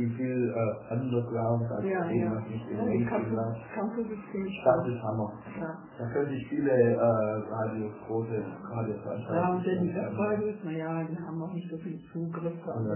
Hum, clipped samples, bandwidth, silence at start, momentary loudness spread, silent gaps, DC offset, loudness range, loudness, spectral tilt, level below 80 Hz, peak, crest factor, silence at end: none; under 0.1%; 3.2 kHz; 0 s; 10 LU; none; under 0.1%; 3 LU; -31 LUFS; -8.5 dB/octave; -62 dBFS; -12 dBFS; 18 dB; 0 s